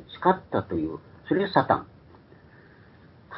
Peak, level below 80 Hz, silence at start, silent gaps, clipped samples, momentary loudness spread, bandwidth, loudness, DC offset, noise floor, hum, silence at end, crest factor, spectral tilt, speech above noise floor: -4 dBFS; -54 dBFS; 0 s; none; under 0.1%; 9 LU; 5.8 kHz; -26 LUFS; under 0.1%; -52 dBFS; none; 0 s; 24 dB; -10.5 dB/octave; 28 dB